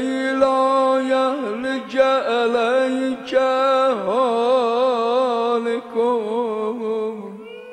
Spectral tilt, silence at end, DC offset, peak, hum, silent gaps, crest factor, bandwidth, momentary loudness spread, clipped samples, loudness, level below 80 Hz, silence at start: -4.5 dB/octave; 0 s; under 0.1%; -4 dBFS; none; none; 16 dB; 10 kHz; 7 LU; under 0.1%; -19 LUFS; -64 dBFS; 0 s